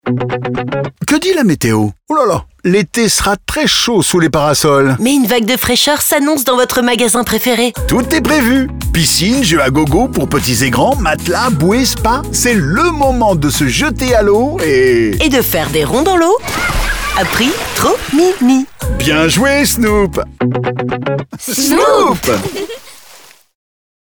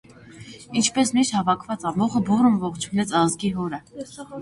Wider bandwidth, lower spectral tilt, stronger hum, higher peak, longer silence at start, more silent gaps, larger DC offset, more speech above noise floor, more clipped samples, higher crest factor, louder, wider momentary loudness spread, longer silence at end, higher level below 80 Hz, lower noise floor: first, over 20 kHz vs 11.5 kHz; about the same, -4 dB/octave vs -4.5 dB/octave; neither; first, 0 dBFS vs -6 dBFS; second, 0.05 s vs 0.2 s; neither; neither; first, 29 dB vs 21 dB; neither; about the same, 12 dB vs 16 dB; first, -12 LUFS vs -22 LUFS; second, 7 LU vs 17 LU; first, 1 s vs 0 s; first, -28 dBFS vs -56 dBFS; about the same, -40 dBFS vs -43 dBFS